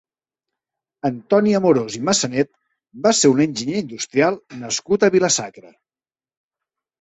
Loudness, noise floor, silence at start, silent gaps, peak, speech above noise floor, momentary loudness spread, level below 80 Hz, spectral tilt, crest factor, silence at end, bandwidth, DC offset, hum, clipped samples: -18 LUFS; under -90 dBFS; 1.05 s; none; -2 dBFS; over 72 dB; 10 LU; -60 dBFS; -4 dB/octave; 18 dB; 1.4 s; 8.4 kHz; under 0.1%; none; under 0.1%